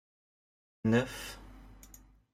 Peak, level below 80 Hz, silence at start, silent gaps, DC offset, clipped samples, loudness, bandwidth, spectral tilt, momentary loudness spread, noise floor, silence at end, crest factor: -16 dBFS; -56 dBFS; 0.85 s; none; under 0.1%; under 0.1%; -33 LUFS; 16 kHz; -6 dB/octave; 25 LU; -57 dBFS; 0.35 s; 20 dB